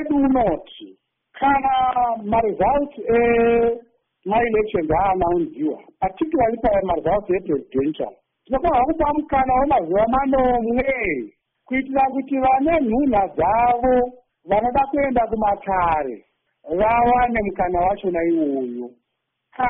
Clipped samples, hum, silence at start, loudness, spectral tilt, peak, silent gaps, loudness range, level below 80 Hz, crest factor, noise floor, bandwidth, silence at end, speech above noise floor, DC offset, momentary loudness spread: under 0.1%; none; 0 s; -20 LUFS; -1.5 dB/octave; -6 dBFS; none; 2 LU; -40 dBFS; 14 dB; -77 dBFS; 3.9 kHz; 0 s; 58 dB; under 0.1%; 9 LU